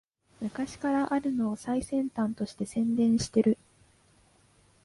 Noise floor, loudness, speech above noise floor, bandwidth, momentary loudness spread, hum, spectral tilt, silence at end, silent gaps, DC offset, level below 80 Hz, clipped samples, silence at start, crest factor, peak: -63 dBFS; -29 LUFS; 35 dB; 11.5 kHz; 10 LU; none; -6 dB/octave; 1.3 s; none; under 0.1%; -58 dBFS; under 0.1%; 0.4 s; 18 dB; -12 dBFS